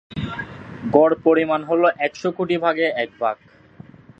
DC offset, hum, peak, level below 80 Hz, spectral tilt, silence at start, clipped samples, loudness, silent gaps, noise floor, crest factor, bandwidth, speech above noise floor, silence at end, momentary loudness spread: under 0.1%; none; 0 dBFS; -52 dBFS; -6.5 dB/octave; 0.1 s; under 0.1%; -20 LUFS; none; -45 dBFS; 20 dB; 7.6 kHz; 26 dB; 0.85 s; 15 LU